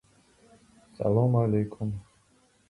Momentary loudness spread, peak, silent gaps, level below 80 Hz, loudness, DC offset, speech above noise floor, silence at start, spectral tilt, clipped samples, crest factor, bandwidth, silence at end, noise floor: 12 LU; -10 dBFS; none; -56 dBFS; -27 LUFS; under 0.1%; 39 dB; 1 s; -10.5 dB/octave; under 0.1%; 18 dB; 10.5 kHz; 0.7 s; -65 dBFS